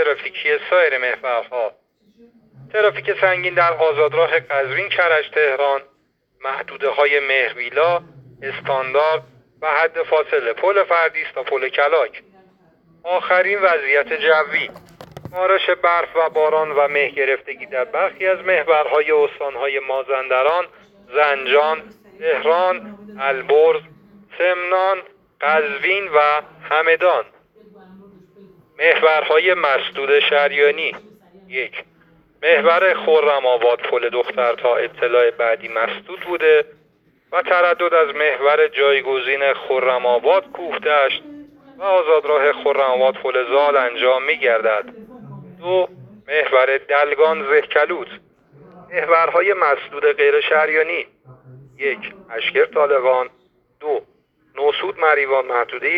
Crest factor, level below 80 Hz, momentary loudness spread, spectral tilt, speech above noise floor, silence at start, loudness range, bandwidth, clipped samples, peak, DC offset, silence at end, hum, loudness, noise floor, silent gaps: 18 dB; -66 dBFS; 10 LU; -5.5 dB/octave; 41 dB; 0 s; 3 LU; 5.4 kHz; under 0.1%; 0 dBFS; under 0.1%; 0 s; none; -17 LUFS; -59 dBFS; none